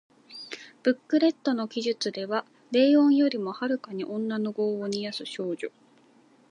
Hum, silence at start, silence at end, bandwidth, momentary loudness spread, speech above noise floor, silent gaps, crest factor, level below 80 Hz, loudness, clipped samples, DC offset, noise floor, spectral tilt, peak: none; 0.3 s; 0.85 s; 10.5 kHz; 16 LU; 34 dB; none; 16 dB; -82 dBFS; -27 LUFS; under 0.1%; under 0.1%; -59 dBFS; -5 dB/octave; -10 dBFS